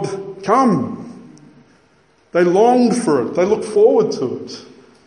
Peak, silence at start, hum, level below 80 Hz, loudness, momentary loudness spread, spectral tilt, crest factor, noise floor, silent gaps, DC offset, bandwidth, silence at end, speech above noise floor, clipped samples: -2 dBFS; 0 s; none; -62 dBFS; -16 LUFS; 18 LU; -6 dB/octave; 16 dB; -55 dBFS; none; under 0.1%; 11 kHz; 0.45 s; 40 dB; under 0.1%